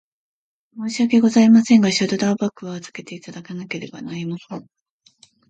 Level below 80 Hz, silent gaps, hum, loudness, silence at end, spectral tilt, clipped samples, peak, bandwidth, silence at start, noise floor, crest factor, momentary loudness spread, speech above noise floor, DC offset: -66 dBFS; none; none; -17 LUFS; 0.9 s; -5 dB/octave; under 0.1%; -4 dBFS; 8.8 kHz; 0.75 s; -55 dBFS; 16 dB; 22 LU; 37 dB; under 0.1%